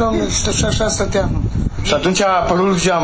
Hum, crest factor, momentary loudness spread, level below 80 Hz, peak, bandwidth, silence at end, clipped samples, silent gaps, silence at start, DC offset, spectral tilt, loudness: none; 14 dB; 5 LU; -26 dBFS; -2 dBFS; 8 kHz; 0 s; under 0.1%; none; 0 s; under 0.1%; -4.5 dB/octave; -16 LUFS